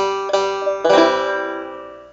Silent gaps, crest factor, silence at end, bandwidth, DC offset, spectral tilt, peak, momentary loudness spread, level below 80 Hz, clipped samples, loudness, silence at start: none; 18 dB; 0.05 s; 8 kHz; under 0.1%; -3.5 dB/octave; 0 dBFS; 16 LU; -56 dBFS; under 0.1%; -17 LUFS; 0 s